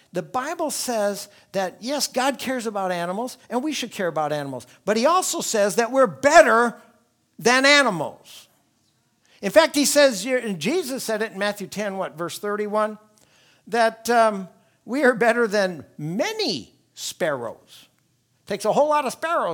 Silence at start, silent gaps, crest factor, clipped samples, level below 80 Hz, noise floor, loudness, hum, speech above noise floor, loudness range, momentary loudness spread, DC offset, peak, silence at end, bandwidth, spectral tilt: 0.15 s; none; 22 dB; under 0.1%; -68 dBFS; -66 dBFS; -21 LUFS; none; 44 dB; 7 LU; 14 LU; under 0.1%; 0 dBFS; 0 s; 19.5 kHz; -3 dB/octave